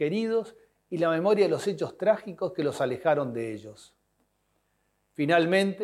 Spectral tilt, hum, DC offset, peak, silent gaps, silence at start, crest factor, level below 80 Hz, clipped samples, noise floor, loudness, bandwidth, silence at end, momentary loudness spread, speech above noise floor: -6 dB/octave; none; under 0.1%; -8 dBFS; none; 0 s; 20 dB; -74 dBFS; under 0.1%; -73 dBFS; -27 LUFS; 13 kHz; 0 s; 13 LU; 47 dB